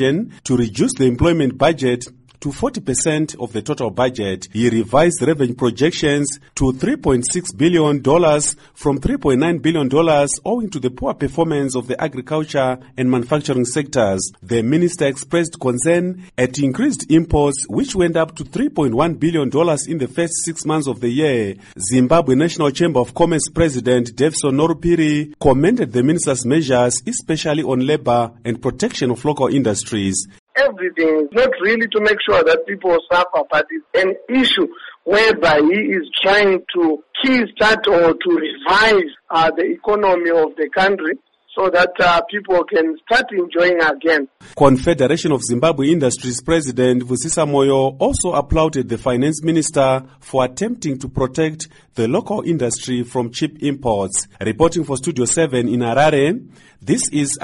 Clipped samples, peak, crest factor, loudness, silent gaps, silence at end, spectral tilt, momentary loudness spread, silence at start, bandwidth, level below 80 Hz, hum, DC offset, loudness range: under 0.1%; 0 dBFS; 16 dB; -17 LUFS; 30.39-30.47 s; 0.05 s; -4.5 dB/octave; 8 LU; 0 s; 11.5 kHz; -40 dBFS; none; under 0.1%; 4 LU